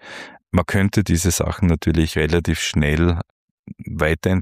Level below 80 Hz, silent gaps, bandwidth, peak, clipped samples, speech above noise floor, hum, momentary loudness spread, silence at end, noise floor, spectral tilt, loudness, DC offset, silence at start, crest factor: -30 dBFS; 3.30-3.64 s; 15.5 kHz; -4 dBFS; under 0.1%; 20 dB; none; 15 LU; 0 s; -38 dBFS; -5.5 dB/octave; -19 LUFS; under 0.1%; 0.05 s; 16 dB